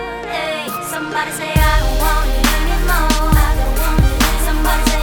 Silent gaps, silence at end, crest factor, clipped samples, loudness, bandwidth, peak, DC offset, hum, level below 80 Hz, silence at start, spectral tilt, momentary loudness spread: none; 0 s; 14 dB; under 0.1%; -17 LUFS; 19.5 kHz; 0 dBFS; under 0.1%; none; -16 dBFS; 0 s; -4 dB/octave; 7 LU